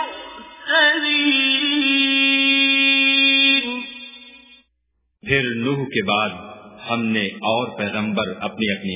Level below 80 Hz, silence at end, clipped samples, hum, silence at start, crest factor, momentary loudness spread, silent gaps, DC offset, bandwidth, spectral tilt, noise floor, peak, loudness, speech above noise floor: -56 dBFS; 0 s; under 0.1%; none; 0 s; 16 dB; 19 LU; none; under 0.1%; 3.9 kHz; -8 dB/octave; -70 dBFS; -4 dBFS; -16 LUFS; 49 dB